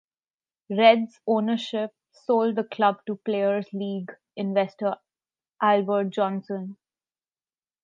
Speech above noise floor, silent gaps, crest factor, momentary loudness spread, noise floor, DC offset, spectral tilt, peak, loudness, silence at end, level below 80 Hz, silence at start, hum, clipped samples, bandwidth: over 66 dB; none; 22 dB; 15 LU; under -90 dBFS; under 0.1%; -7 dB/octave; -4 dBFS; -25 LUFS; 1.1 s; -84 dBFS; 0.7 s; none; under 0.1%; 7.6 kHz